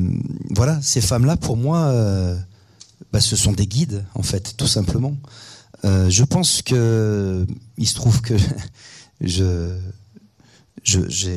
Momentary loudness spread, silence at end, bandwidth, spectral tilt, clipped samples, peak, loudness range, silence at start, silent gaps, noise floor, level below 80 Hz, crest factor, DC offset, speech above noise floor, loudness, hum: 12 LU; 0 s; 14 kHz; -4.5 dB/octave; under 0.1%; 0 dBFS; 4 LU; 0 s; none; -53 dBFS; -38 dBFS; 18 dB; under 0.1%; 35 dB; -19 LUFS; none